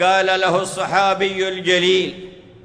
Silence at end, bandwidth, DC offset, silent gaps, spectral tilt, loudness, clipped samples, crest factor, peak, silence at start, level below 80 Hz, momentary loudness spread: 0.25 s; 10.5 kHz; under 0.1%; none; -3.5 dB/octave; -17 LUFS; under 0.1%; 14 dB; -4 dBFS; 0 s; -58 dBFS; 6 LU